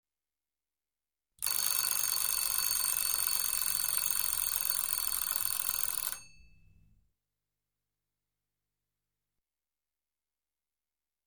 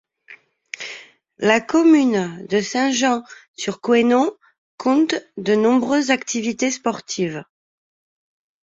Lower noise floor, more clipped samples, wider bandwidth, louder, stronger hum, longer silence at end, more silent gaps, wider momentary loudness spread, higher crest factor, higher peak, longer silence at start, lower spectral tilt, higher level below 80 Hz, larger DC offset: first, under -90 dBFS vs -47 dBFS; neither; first, over 20 kHz vs 7.8 kHz; second, -29 LUFS vs -19 LUFS; neither; first, 5 s vs 1.2 s; second, none vs 3.48-3.54 s, 4.58-4.78 s; second, 4 LU vs 16 LU; first, 28 dB vs 18 dB; second, -8 dBFS vs -2 dBFS; first, 1.4 s vs 0.3 s; second, 2.5 dB/octave vs -4 dB/octave; about the same, -66 dBFS vs -64 dBFS; neither